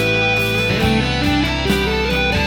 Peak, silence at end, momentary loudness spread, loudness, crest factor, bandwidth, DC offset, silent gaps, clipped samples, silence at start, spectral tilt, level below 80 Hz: -4 dBFS; 0 s; 2 LU; -16 LUFS; 14 dB; 17.5 kHz; under 0.1%; none; under 0.1%; 0 s; -5 dB/octave; -28 dBFS